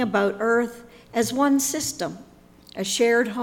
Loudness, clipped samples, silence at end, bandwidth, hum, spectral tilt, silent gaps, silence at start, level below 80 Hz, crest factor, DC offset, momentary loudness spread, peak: -23 LUFS; under 0.1%; 0 s; 18.5 kHz; none; -3 dB/octave; none; 0 s; -60 dBFS; 14 dB; under 0.1%; 12 LU; -10 dBFS